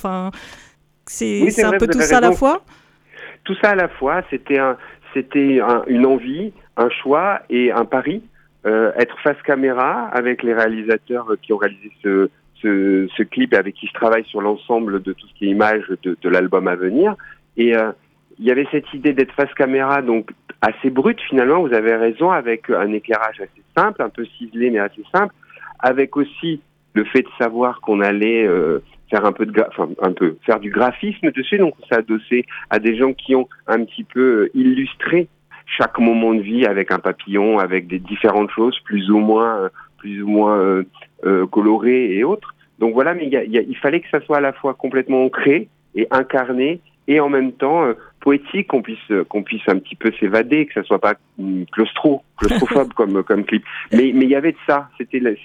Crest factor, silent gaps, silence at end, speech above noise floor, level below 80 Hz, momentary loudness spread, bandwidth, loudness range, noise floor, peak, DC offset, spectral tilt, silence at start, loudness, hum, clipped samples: 18 dB; none; 0 s; 23 dB; -46 dBFS; 9 LU; 12.5 kHz; 2 LU; -40 dBFS; 0 dBFS; under 0.1%; -5.5 dB/octave; 0 s; -17 LUFS; none; under 0.1%